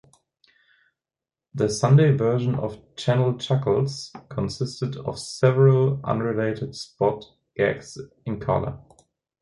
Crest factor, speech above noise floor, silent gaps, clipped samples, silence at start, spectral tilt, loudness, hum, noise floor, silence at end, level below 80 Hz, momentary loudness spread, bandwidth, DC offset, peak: 18 dB; over 68 dB; none; under 0.1%; 1.55 s; -7 dB/octave; -23 LUFS; none; under -90 dBFS; 0.65 s; -52 dBFS; 16 LU; 11.5 kHz; under 0.1%; -6 dBFS